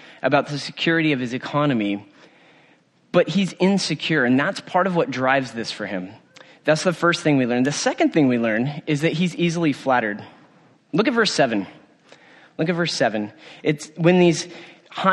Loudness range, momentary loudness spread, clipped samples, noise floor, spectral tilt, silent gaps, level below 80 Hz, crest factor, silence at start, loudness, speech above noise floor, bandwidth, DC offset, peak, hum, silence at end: 3 LU; 10 LU; under 0.1%; -57 dBFS; -5 dB/octave; none; -66 dBFS; 18 dB; 0.05 s; -21 LUFS; 37 dB; 11.5 kHz; under 0.1%; -2 dBFS; none; 0 s